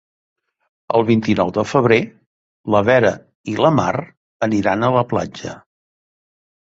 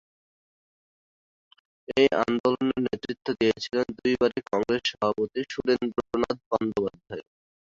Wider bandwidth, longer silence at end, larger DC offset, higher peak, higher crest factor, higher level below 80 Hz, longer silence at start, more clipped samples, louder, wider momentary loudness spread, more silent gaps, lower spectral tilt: about the same, 7.8 kHz vs 7.6 kHz; first, 1.1 s vs 0.55 s; neither; first, -2 dBFS vs -8 dBFS; about the same, 18 dB vs 20 dB; first, -50 dBFS vs -60 dBFS; second, 0.9 s vs 1.9 s; neither; first, -17 LUFS vs -26 LUFS; first, 15 LU vs 8 LU; first, 2.26-2.64 s, 3.35-3.44 s, 4.17-4.40 s vs 2.40-2.44 s, 6.46-6.51 s; about the same, -6.5 dB/octave vs -5.5 dB/octave